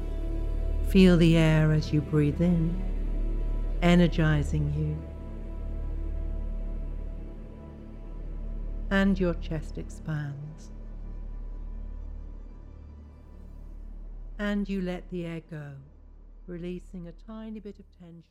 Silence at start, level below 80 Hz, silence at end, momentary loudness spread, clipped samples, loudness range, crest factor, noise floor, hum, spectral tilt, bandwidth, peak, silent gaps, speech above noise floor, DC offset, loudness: 0 s; -34 dBFS; 0.1 s; 24 LU; under 0.1%; 17 LU; 20 dB; -48 dBFS; none; -7.5 dB/octave; 12 kHz; -8 dBFS; none; 23 dB; under 0.1%; -28 LUFS